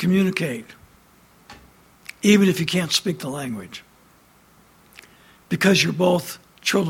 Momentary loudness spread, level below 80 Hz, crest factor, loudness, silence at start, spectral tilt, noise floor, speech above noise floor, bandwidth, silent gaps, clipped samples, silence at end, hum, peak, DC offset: 19 LU; -58 dBFS; 20 dB; -20 LUFS; 0 s; -4.5 dB/octave; -54 dBFS; 34 dB; 17 kHz; none; under 0.1%; 0 s; none; -4 dBFS; under 0.1%